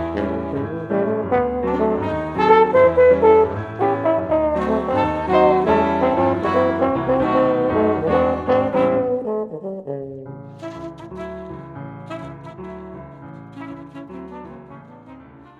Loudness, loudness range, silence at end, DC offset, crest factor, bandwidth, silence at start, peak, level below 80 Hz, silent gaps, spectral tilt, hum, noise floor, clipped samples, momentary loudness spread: -18 LUFS; 18 LU; 0.15 s; under 0.1%; 18 dB; 7 kHz; 0 s; 0 dBFS; -44 dBFS; none; -8.5 dB/octave; none; -42 dBFS; under 0.1%; 21 LU